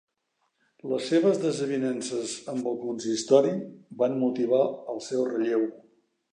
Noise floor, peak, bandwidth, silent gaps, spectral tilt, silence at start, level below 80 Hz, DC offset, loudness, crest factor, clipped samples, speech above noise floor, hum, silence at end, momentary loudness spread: -76 dBFS; -6 dBFS; 11 kHz; none; -5 dB/octave; 0.85 s; -78 dBFS; under 0.1%; -27 LUFS; 20 dB; under 0.1%; 50 dB; none; 0.55 s; 10 LU